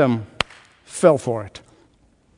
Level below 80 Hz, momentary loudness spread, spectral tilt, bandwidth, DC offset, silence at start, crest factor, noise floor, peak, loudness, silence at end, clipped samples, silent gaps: -56 dBFS; 16 LU; -5.5 dB/octave; 11 kHz; under 0.1%; 0 s; 22 dB; -58 dBFS; 0 dBFS; -21 LUFS; 0.8 s; under 0.1%; none